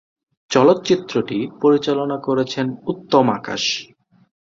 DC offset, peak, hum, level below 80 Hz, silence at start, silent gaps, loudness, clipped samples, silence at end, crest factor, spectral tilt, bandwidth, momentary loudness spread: under 0.1%; -2 dBFS; none; -60 dBFS; 0.5 s; none; -19 LUFS; under 0.1%; 0.7 s; 18 dB; -5 dB/octave; 7.6 kHz; 9 LU